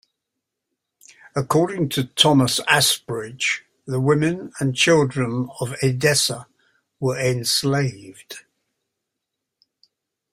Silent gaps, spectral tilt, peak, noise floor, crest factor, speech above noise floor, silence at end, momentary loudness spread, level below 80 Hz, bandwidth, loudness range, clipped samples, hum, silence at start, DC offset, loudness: none; -4 dB/octave; 0 dBFS; -82 dBFS; 22 dB; 61 dB; 1.95 s; 12 LU; -58 dBFS; 16 kHz; 6 LU; under 0.1%; none; 1.35 s; under 0.1%; -20 LUFS